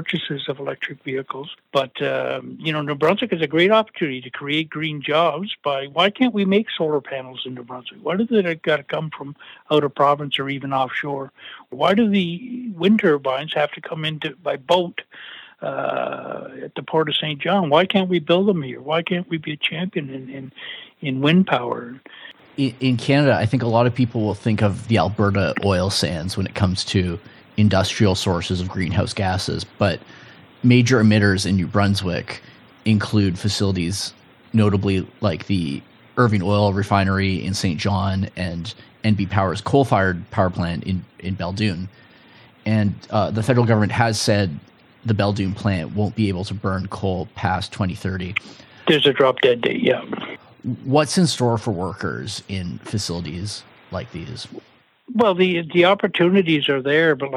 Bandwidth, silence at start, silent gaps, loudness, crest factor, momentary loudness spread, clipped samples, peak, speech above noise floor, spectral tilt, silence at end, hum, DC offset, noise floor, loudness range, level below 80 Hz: 13 kHz; 0 s; none; -20 LUFS; 20 dB; 14 LU; under 0.1%; 0 dBFS; 28 dB; -6 dB/octave; 0 s; none; under 0.1%; -49 dBFS; 4 LU; -52 dBFS